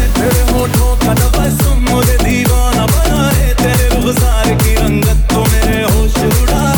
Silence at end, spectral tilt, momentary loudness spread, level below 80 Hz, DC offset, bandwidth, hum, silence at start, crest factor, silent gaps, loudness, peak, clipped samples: 0 s; -5 dB/octave; 1 LU; -14 dBFS; under 0.1%; over 20 kHz; none; 0 s; 10 dB; none; -12 LUFS; 0 dBFS; under 0.1%